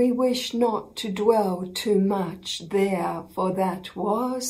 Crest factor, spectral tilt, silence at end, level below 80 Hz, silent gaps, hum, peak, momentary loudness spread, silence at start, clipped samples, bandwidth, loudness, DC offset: 18 dB; -5 dB/octave; 0 s; -62 dBFS; none; none; -6 dBFS; 8 LU; 0 s; under 0.1%; 16 kHz; -25 LUFS; under 0.1%